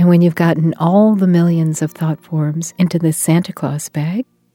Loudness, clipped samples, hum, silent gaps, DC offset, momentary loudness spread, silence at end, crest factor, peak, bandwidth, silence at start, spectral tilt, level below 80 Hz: -15 LUFS; under 0.1%; none; none; under 0.1%; 10 LU; 0.3 s; 14 dB; 0 dBFS; 16 kHz; 0 s; -7 dB/octave; -62 dBFS